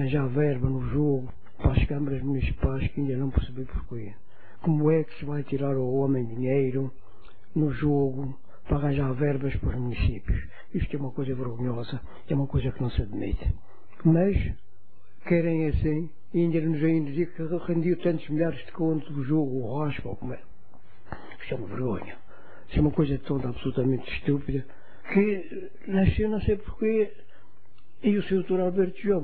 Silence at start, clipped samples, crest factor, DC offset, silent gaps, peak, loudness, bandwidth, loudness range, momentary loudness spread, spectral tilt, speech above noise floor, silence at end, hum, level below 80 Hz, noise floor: 0 s; under 0.1%; 20 dB; 2%; none; -8 dBFS; -28 LUFS; 4.7 kHz; 4 LU; 12 LU; -12 dB/octave; 35 dB; 0 s; none; -38 dBFS; -62 dBFS